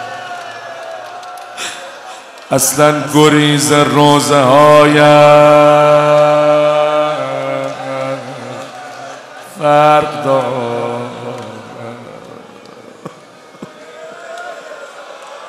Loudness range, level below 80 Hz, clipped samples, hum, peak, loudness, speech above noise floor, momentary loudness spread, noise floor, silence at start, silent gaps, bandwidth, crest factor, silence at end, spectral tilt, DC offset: 23 LU; -56 dBFS; 0.5%; none; 0 dBFS; -10 LUFS; 30 dB; 24 LU; -38 dBFS; 0 s; none; 16 kHz; 12 dB; 0 s; -4.5 dB/octave; under 0.1%